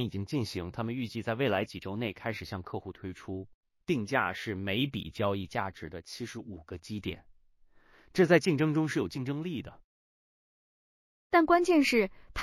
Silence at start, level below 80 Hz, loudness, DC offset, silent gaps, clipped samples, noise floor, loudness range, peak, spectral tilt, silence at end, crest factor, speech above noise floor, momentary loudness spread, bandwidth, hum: 0 s; -58 dBFS; -31 LUFS; under 0.1%; 3.54-3.63 s, 9.84-11.30 s; under 0.1%; -61 dBFS; 6 LU; -10 dBFS; -6 dB/octave; 0 s; 22 dB; 31 dB; 18 LU; 15 kHz; none